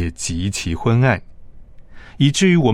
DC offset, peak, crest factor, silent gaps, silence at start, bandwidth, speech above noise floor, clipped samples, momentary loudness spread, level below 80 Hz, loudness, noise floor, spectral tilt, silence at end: under 0.1%; -2 dBFS; 16 dB; none; 0 s; 13.5 kHz; 21 dB; under 0.1%; 9 LU; -40 dBFS; -18 LUFS; -38 dBFS; -5.5 dB/octave; 0 s